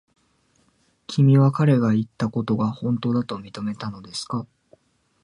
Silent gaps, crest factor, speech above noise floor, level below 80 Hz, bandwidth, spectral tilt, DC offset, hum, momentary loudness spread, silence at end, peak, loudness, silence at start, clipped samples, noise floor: none; 16 dB; 43 dB; -60 dBFS; 11 kHz; -7.5 dB/octave; under 0.1%; none; 15 LU; 0.8 s; -6 dBFS; -22 LUFS; 1.1 s; under 0.1%; -64 dBFS